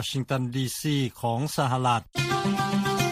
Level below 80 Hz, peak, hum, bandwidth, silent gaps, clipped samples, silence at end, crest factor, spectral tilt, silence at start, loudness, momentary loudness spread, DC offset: -56 dBFS; -10 dBFS; none; 15.5 kHz; none; under 0.1%; 0 s; 16 dB; -5 dB/octave; 0 s; -26 LUFS; 4 LU; under 0.1%